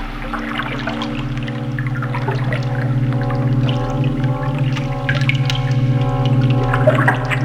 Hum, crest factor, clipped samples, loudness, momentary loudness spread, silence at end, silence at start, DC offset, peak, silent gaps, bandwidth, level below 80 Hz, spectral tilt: none; 18 dB; under 0.1%; -18 LUFS; 8 LU; 0 s; 0 s; under 0.1%; 0 dBFS; none; 9 kHz; -32 dBFS; -7.5 dB/octave